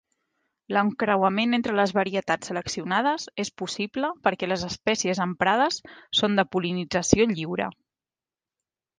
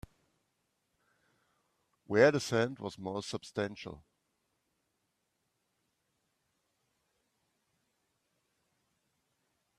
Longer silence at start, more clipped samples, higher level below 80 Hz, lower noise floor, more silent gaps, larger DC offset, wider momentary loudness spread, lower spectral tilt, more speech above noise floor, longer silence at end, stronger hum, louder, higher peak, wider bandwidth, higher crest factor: second, 0.7 s vs 2.1 s; neither; first, -54 dBFS vs -72 dBFS; first, under -90 dBFS vs -82 dBFS; neither; neither; second, 8 LU vs 15 LU; about the same, -4 dB/octave vs -5 dB/octave; first, over 65 dB vs 50 dB; second, 1.25 s vs 5.8 s; neither; first, -25 LUFS vs -32 LUFS; first, -2 dBFS vs -12 dBFS; second, 10 kHz vs 13.5 kHz; about the same, 24 dB vs 28 dB